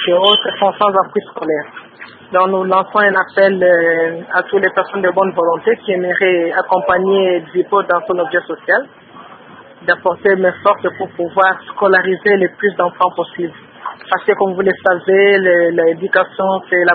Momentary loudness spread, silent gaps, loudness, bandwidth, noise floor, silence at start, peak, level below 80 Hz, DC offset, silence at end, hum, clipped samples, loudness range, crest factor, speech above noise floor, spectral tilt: 9 LU; none; -14 LUFS; 4.6 kHz; -38 dBFS; 0 s; 0 dBFS; -62 dBFS; under 0.1%; 0 s; none; under 0.1%; 3 LU; 14 dB; 25 dB; -8 dB/octave